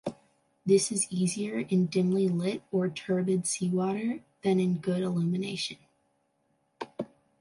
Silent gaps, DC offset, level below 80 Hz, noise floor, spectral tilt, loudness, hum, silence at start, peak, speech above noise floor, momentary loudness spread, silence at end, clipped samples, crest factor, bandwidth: none; under 0.1%; -72 dBFS; -73 dBFS; -5.5 dB/octave; -29 LUFS; none; 0.05 s; -12 dBFS; 46 dB; 13 LU; 0.35 s; under 0.1%; 18 dB; 11.5 kHz